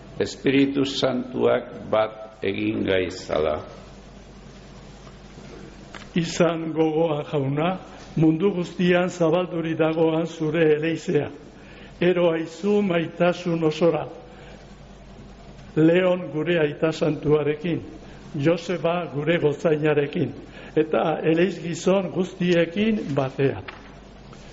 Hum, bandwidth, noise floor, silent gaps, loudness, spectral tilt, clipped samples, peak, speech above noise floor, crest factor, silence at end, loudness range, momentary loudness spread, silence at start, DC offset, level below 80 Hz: none; 8 kHz; -44 dBFS; none; -23 LUFS; -5.5 dB/octave; under 0.1%; -8 dBFS; 22 dB; 14 dB; 0 s; 4 LU; 20 LU; 0 s; under 0.1%; -52 dBFS